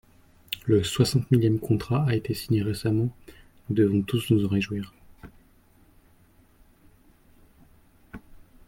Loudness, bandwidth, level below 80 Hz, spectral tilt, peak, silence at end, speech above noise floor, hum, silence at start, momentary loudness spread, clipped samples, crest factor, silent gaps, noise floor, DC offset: -25 LUFS; 16.5 kHz; -52 dBFS; -6.5 dB/octave; -8 dBFS; 0.3 s; 35 dB; none; 0.5 s; 16 LU; under 0.1%; 20 dB; none; -58 dBFS; under 0.1%